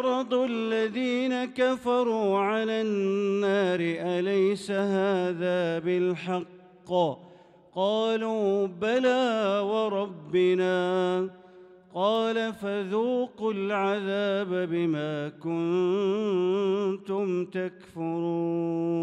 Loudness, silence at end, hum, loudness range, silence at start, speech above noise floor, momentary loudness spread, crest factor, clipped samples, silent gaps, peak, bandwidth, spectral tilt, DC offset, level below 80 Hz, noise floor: -27 LUFS; 0 s; none; 3 LU; 0 s; 25 dB; 6 LU; 14 dB; under 0.1%; none; -12 dBFS; 10.5 kHz; -6.5 dB/octave; under 0.1%; -74 dBFS; -52 dBFS